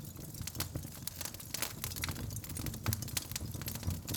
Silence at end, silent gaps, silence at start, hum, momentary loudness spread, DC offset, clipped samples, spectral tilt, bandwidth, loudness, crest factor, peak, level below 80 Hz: 0 s; none; 0 s; none; 5 LU; under 0.1%; under 0.1%; -3.5 dB/octave; over 20 kHz; -39 LUFS; 28 dB; -14 dBFS; -54 dBFS